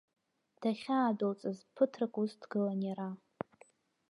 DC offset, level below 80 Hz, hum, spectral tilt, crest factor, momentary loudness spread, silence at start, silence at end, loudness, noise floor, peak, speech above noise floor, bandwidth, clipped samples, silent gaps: under 0.1%; -84 dBFS; none; -7.5 dB/octave; 20 dB; 13 LU; 0.6 s; 0.95 s; -36 LUFS; -66 dBFS; -16 dBFS; 31 dB; 11 kHz; under 0.1%; none